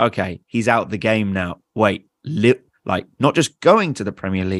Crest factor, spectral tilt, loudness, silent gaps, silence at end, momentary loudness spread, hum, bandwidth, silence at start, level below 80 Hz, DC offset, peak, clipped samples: 18 dB; -5.5 dB/octave; -19 LUFS; none; 0 s; 10 LU; none; 12.5 kHz; 0 s; -54 dBFS; under 0.1%; 0 dBFS; under 0.1%